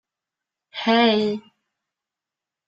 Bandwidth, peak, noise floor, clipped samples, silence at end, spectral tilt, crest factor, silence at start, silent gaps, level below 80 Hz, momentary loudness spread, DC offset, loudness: 7.6 kHz; -6 dBFS; -88 dBFS; under 0.1%; 1.25 s; -5.5 dB/octave; 18 dB; 0.75 s; none; -70 dBFS; 16 LU; under 0.1%; -20 LUFS